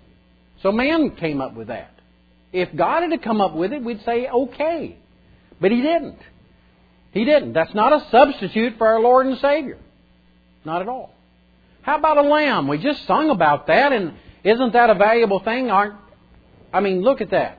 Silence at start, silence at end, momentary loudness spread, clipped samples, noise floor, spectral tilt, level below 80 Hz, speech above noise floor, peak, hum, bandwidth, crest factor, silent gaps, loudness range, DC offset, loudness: 0.65 s; 0.05 s; 14 LU; under 0.1%; -55 dBFS; -8 dB/octave; -52 dBFS; 37 dB; 0 dBFS; none; 5 kHz; 20 dB; none; 6 LU; under 0.1%; -18 LUFS